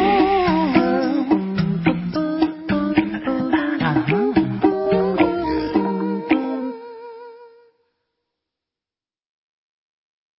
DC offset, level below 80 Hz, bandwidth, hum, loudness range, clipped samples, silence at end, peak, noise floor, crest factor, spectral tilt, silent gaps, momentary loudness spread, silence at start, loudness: under 0.1%; -46 dBFS; 5.8 kHz; none; 8 LU; under 0.1%; 2.9 s; -2 dBFS; under -90 dBFS; 20 dB; -11.5 dB/octave; none; 8 LU; 0 s; -20 LUFS